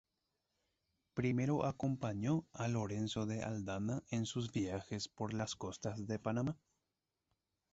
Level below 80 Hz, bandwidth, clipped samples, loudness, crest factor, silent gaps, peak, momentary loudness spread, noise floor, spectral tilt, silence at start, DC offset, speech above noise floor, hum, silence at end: -66 dBFS; 8 kHz; under 0.1%; -40 LUFS; 18 dB; none; -22 dBFS; 6 LU; -89 dBFS; -6.5 dB/octave; 1.15 s; under 0.1%; 50 dB; none; 1.2 s